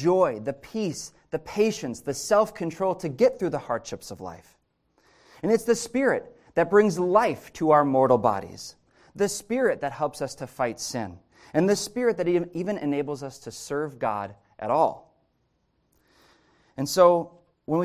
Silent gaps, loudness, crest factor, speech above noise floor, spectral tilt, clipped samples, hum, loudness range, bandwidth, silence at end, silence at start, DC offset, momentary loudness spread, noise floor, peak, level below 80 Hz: none; -25 LUFS; 20 dB; 46 dB; -5 dB/octave; under 0.1%; none; 7 LU; 16 kHz; 0 s; 0 s; under 0.1%; 17 LU; -71 dBFS; -4 dBFS; -62 dBFS